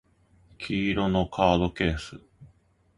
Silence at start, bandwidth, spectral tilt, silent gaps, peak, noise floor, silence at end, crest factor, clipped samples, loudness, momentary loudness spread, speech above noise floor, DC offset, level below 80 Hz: 0.6 s; 11.5 kHz; -6.5 dB/octave; none; -6 dBFS; -62 dBFS; 0.5 s; 22 dB; under 0.1%; -26 LUFS; 14 LU; 36 dB; under 0.1%; -42 dBFS